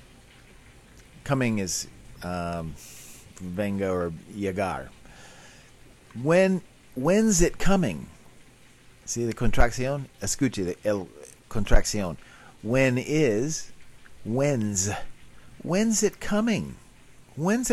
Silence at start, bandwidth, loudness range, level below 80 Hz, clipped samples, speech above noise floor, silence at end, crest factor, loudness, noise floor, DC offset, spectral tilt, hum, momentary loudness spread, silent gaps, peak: 1.25 s; 13.5 kHz; 7 LU; -34 dBFS; under 0.1%; 29 dB; 0 s; 20 dB; -26 LUFS; -53 dBFS; under 0.1%; -5 dB/octave; none; 20 LU; none; -6 dBFS